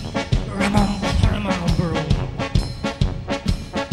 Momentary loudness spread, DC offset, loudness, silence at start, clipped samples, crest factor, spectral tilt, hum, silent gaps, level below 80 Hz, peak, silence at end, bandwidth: 5 LU; under 0.1%; -22 LUFS; 0 s; under 0.1%; 20 dB; -6 dB/octave; none; none; -26 dBFS; 0 dBFS; 0 s; 13 kHz